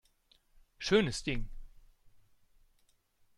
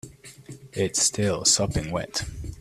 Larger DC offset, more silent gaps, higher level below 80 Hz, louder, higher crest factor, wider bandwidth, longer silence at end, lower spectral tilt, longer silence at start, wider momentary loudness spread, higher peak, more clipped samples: neither; neither; about the same, -48 dBFS vs -44 dBFS; second, -32 LUFS vs -23 LUFS; about the same, 24 dB vs 20 dB; second, 12 kHz vs 15 kHz; first, 1.6 s vs 0 s; first, -4.5 dB/octave vs -3 dB/octave; first, 0.8 s vs 0.05 s; second, 13 LU vs 23 LU; second, -14 dBFS vs -6 dBFS; neither